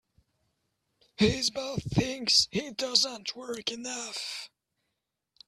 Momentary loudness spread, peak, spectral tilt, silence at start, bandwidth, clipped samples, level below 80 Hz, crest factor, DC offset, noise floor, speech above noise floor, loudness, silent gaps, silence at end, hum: 13 LU; -6 dBFS; -3 dB/octave; 1.2 s; 14.5 kHz; under 0.1%; -56 dBFS; 26 dB; under 0.1%; -84 dBFS; 54 dB; -28 LUFS; none; 1 s; none